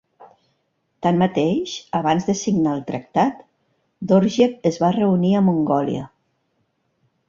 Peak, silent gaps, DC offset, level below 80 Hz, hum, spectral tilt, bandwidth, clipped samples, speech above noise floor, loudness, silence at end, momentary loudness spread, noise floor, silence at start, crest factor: -2 dBFS; none; under 0.1%; -58 dBFS; none; -6.5 dB/octave; 7.4 kHz; under 0.1%; 51 dB; -20 LUFS; 1.2 s; 8 LU; -70 dBFS; 0.2 s; 18 dB